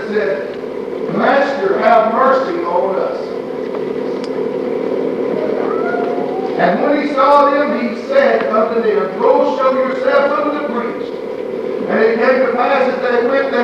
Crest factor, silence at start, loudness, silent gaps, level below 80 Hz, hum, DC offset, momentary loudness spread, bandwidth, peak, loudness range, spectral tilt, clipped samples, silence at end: 14 dB; 0 s; -15 LUFS; none; -60 dBFS; none; under 0.1%; 10 LU; 8 kHz; 0 dBFS; 6 LU; -6.5 dB/octave; under 0.1%; 0 s